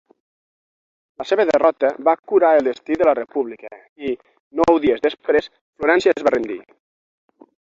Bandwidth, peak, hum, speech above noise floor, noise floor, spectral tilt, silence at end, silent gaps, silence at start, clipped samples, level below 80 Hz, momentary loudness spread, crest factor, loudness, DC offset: 7.6 kHz; -2 dBFS; none; over 72 dB; under -90 dBFS; -5.5 dB/octave; 1.15 s; 2.19-2.23 s, 3.89-3.96 s, 4.40-4.51 s, 5.61-5.73 s; 1.2 s; under 0.1%; -54 dBFS; 15 LU; 18 dB; -18 LUFS; under 0.1%